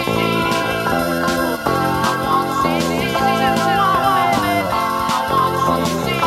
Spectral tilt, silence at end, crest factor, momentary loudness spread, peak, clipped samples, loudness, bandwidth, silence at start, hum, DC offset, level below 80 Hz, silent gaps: -4.5 dB/octave; 0 s; 16 dB; 3 LU; -2 dBFS; under 0.1%; -17 LUFS; 17 kHz; 0 s; none; under 0.1%; -42 dBFS; none